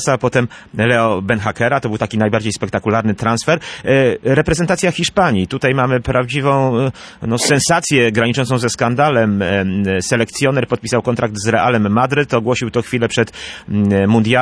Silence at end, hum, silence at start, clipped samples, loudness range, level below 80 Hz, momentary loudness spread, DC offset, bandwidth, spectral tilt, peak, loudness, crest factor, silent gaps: 0 s; none; 0 s; under 0.1%; 2 LU; -42 dBFS; 5 LU; under 0.1%; 11 kHz; -5 dB/octave; -2 dBFS; -15 LUFS; 14 dB; none